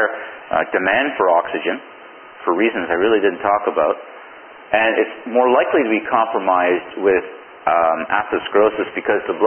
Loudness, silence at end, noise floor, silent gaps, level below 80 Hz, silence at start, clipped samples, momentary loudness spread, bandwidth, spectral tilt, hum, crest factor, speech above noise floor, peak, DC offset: -18 LUFS; 0 s; -39 dBFS; none; -56 dBFS; 0 s; under 0.1%; 8 LU; 3.4 kHz; -9.5 dB/octave; none; 18 dB; 22 dB; 0 dBFS; under 0.1%